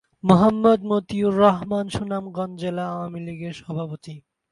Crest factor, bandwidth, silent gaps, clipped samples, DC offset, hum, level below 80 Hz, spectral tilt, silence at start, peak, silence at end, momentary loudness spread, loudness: 22 dB; 11.5 kHz; none; under 0.1%; under 0.1%; none; -54 dBFS; -7.5 dB/octave; 0.25 s; 0 dBFS; 0.3 s; 16 LU; -22 LUFS